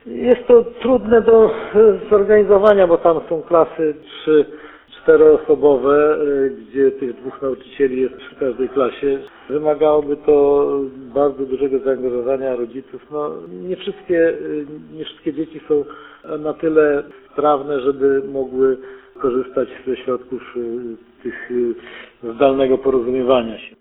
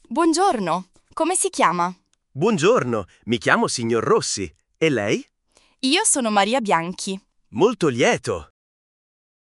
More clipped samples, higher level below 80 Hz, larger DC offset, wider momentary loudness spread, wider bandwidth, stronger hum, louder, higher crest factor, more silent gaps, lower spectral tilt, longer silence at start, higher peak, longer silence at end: neither; first, -50 dBFS vs -58 dBFS; neither; first, 15 LU vs 11 LU; second, 4 kHz vs 11.5 kHz; neither; first, -17 LUFS vs -20 LUFS; second, 16 dB vs 22 dB; neither; first, -9 dB/octave vs -3.5 dB/octave; about the same, 0.05 s vs 0.1 s; about the same, 0 dBFS vs 0 dBFS; second, 0.15 s vs 1.15 s